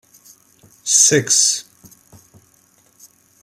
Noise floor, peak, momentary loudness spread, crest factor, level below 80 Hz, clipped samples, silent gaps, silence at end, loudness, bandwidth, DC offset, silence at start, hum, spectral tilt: -55 dBFS; 0 dBFS; 13 LU; 22 dB; -68 dBFS; under 0.1%; none; 1.8 s; -13 LUFS; 16.5 kHz; under 0.1%; 0.85 s; none; -1 dB/octave